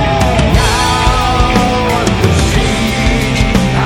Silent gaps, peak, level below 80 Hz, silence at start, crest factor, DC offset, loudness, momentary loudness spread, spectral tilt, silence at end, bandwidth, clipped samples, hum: none; 0 dBFS; -18 dBFS; 0 s; 10 dB; under 0.1%; -11 LUFS; 2 LU; -5 dB/octave; 0 s; 17.5 kHz; 0.2%; none